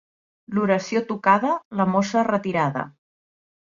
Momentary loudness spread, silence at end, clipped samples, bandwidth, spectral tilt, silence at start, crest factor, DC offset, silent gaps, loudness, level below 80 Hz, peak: 7 LU; 0.8 s; under 0.1%; 7.4 kHz; -6.5 dB/octave; 0.5 s; 20 dB; under 0.1%; 1.65-1.71 s; -22 LUFS; -66 dBFS; -4 dBFS